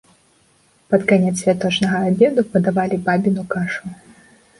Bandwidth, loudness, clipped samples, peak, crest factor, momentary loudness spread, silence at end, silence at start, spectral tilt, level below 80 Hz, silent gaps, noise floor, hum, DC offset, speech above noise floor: 11.5 kHz; -18 LUFS; under 0.1%; -2 dBFS; 16 dB; 8 LU; 0.65 s; 0.9 s; -6 dB/octave; -56 dBFS; none; -57 dBFS; none; under 0.1%; 40 dB